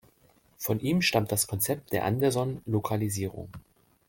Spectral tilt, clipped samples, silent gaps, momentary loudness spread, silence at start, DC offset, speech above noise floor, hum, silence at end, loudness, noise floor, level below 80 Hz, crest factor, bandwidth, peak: -4.5 dB/octave; under 0.1%; none; 11 LU; 0.6 s; under 0.1%; 35 dB; none; 0.5 s; -28 LUFS; -63 dBFS; -60 dBFS; 20 dB; 17 kHz; -10 dBFS